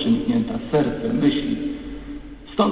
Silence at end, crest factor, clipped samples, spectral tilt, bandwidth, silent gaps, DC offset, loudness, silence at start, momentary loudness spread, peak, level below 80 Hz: 0 s; 16 dB; under 0.1%; -11 dB/octave; 4 kHz; none; 0.1%; -22 LUFS; 0 s; 15 LU; -6 dBFS; -42 dBFS